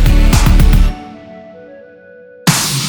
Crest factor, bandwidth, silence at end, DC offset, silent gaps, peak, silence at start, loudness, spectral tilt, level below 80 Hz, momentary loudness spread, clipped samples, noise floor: 12 dB; over 20 kHz; 0 s; under 0.1%; none; 0 dBFS; 0 s; -12 LUFS; -4 dB/octave; -12 dBFS; 23 LU; under 0.1%; -38 dBFS